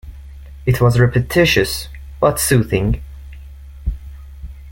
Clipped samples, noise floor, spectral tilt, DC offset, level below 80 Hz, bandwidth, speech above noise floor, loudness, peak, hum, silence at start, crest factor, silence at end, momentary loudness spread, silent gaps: under 0.1%; -35 dBFS; -5 dB/octave; under 0.1%; -30 dBFS; 17 kHz; 21 dB; -16 LUFS; -2 dBFS; none; 0.05 s; 16 dB; 0 s; 24 LU; none